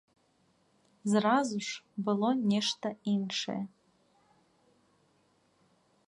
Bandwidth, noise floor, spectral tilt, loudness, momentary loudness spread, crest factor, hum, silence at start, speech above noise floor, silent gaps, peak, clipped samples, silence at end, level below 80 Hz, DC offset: 11.5 kHz; -70 dBFS; -5 dB/octave; -31 LUFS; 11 LU; 20 dB; none; 1.05 s; 40 dB; none; -14 dBFS; under 0.1%; 2.4 s; -78 dBFS; under 0.1%